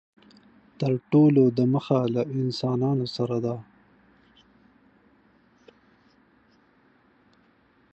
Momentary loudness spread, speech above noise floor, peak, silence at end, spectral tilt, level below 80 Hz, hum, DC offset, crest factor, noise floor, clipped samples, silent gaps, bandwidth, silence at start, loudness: 10 LU; 39 dB; -10 dBFS; 4.35 s; -9 dB/octave; -68 dBFS; none; under 0.1%; 18 dB; -62 dBFS; under 0.1%; none; 8.2 kHz; 0.8 s; -24 LUFS